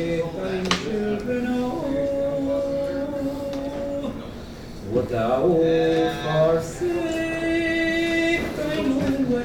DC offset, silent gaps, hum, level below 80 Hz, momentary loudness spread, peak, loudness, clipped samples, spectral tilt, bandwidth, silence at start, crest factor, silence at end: under 0.1%; none; none; -44 dBFS; 9 LU; -2 dBFS; -23 LUFS; under 0.1%; -6 dB/octave; 18 kHz; 0 s; 22 dB; 0 s